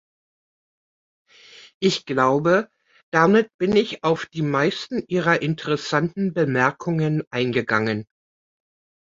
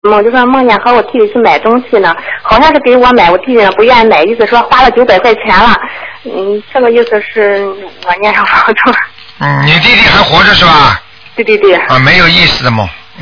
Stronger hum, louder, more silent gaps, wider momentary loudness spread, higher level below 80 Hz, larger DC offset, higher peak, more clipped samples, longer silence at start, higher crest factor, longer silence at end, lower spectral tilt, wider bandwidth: neither; second, -21 LUFS vs -6 LUFS; first, 1.74-1.81 s, 3.03-3.12 s, 3.54-3.59 s, 7.27-7.31 s vs none; second, 6 LU vs 11 LU; second, -60 dBFS vs -30 dBFS; neither; about the same, -2 dBFS vs 0 dBFS; second, under 0.1% vs 5%; first, 1.6 s vs 0.05 s; first, 20 dB vs 6 dB; first, 1.05 s vs 0 s; about the same, -6 dB/octave vs -5.5 dB/octave; first, 7.8 kHz vs 5.4 kHz